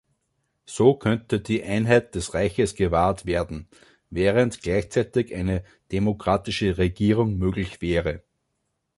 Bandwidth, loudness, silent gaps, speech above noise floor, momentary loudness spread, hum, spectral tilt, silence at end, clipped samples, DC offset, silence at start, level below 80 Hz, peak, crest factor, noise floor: 11.5 kHz; -24 LUFS; none; 53 dB; 10 LU; none; -6.5 dB/octave; 0.8 s; under 0.1%; under 0.1%; 0.7 s; -40 dBFS; -4 dBFS; 20 dB; -76 dBFS